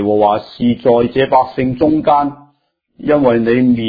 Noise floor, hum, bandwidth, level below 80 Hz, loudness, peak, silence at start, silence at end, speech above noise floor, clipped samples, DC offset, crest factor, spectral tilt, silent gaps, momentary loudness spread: -60 dBFS; none; 5 kHz; -46 dBFS; -13 LUFS; 0 dBFS; 0 s; 0 s; 47 dB; under 0.1%; under 0.1%; 14 dB; -10 dB/octave; none; 5 LU